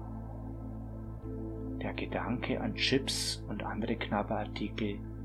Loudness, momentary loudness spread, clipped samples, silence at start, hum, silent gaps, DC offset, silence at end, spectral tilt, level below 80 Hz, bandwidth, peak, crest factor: -35 LUFS; 13 LU; under 0.1%; 0 s; none; none; under 0.1%; 0 s; -4.5 dB/octave; -46 dBFS; 15 kHz; -14 dBFS; 22 dB